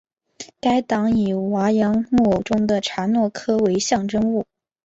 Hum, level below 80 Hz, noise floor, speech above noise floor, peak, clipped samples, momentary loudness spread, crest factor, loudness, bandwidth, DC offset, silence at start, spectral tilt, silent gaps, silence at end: none; -50 dBFS; -42 dBFS; 23 dB; -6 dBFS; under 0.1%; 6 LU; 14 dB; -20 LUFS; 8 kHz; under 0.1%; 0.4 s; -5.5 dB/octave; none; 0.45 s